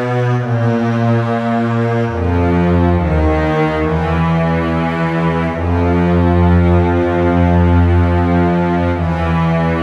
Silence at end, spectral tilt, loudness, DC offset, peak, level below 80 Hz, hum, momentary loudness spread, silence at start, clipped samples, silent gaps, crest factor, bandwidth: 0 s; -9 dB/octave; -14 LUFS; under 0.1%; -2 dBFS; -26 dBFS; none; 4 LU; 0 s; under 0.1%; none; 12 dB; 6.4 kHz